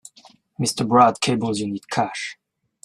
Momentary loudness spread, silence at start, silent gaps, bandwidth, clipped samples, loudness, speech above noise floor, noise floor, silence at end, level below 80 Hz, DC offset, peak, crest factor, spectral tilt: 11 LU; 0.6 s; none; 13.5 kHz; under 0.1%; -21 LUFS; 32 dB; -53 dBFS; 0.5 s; -60 dBFS; under 0.1%; -2 dBFS; 20 dB; -4.5 dB/octave